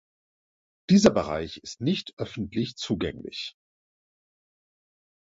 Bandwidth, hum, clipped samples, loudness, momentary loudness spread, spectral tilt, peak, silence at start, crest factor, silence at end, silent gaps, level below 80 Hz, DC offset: 7.8 kHz; none; under 0.1%; -26 LUFS; 17 LU; -5.5 dB/octave; -4 dBFS; 0.9 s; 26 dB; 1.7 s; 2.13-2.17 s; -54 dBFS; under 0.1%